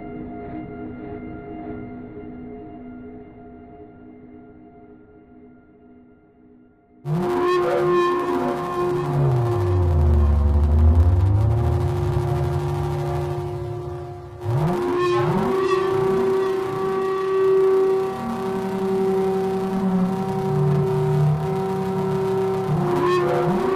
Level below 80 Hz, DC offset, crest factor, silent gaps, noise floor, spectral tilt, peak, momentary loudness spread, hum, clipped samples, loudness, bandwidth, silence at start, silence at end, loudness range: -30 dBFS; under 0.1%; 14 dB; none; -52 dBFS; -8.5 dB/octave; -8 dBFS; 16 LU; none; under 0.1%; -21 LUFS; 14.5 kHz; 0 s; 0 s; 17 LU